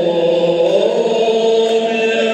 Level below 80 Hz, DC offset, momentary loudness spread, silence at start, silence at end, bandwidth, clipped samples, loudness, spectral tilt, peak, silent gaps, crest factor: -68 dBFS; under 0.1%; 2 LU; 0 s; 0 s; 8.8 kHz; under 0.1%; -14 LUFS; -4.5 dB/octave; -2 dBFS; none; 10 dB